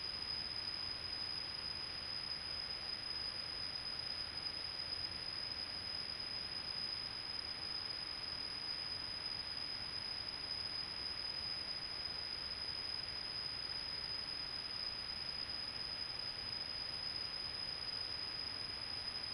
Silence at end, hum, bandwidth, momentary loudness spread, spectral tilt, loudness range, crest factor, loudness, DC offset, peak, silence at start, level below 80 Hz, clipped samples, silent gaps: 0 s; none; 15.5 kHz; 1 LU; -2 dB/octave; 0 LU; 14 dB; -41 LUFS; under 0.1%; -30 dBFS; 0 s; -64 dBFS; under 0.1%; none